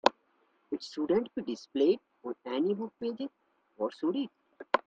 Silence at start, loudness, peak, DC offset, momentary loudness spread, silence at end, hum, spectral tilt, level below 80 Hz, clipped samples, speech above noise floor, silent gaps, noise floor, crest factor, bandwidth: 0.05 s; -33 LUFS; -6 dBFS; under 0.1%; 13 LU; 0.1 s; none; -5.5 dB/octave; -78 dBFS; under 0.1%; 39 dB; none; -71 dBFS; 28 dB; 8 kHz